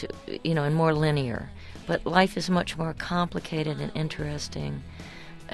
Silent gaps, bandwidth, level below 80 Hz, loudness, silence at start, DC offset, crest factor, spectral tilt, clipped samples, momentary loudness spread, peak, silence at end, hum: none; 12.5 kHz; -48 dBFS; -27 LUFS; 0 s; under 0.1%; 22 dB; -6 dB/octave; under 0.1%; 18 LU; -6 dBFS; 0 s; none